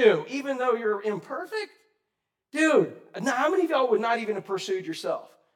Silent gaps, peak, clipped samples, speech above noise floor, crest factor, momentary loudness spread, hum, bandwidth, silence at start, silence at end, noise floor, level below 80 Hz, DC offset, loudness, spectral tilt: none; -6 dBFS; under 0.1%; 58 dB; 20 dB; 12 LU; none; 15.5 kHz; 0 s; 0.3 s; -83 dBFS; under -90 dBFS; under 0.1%; -27 LUFS; -4.5 dB/octave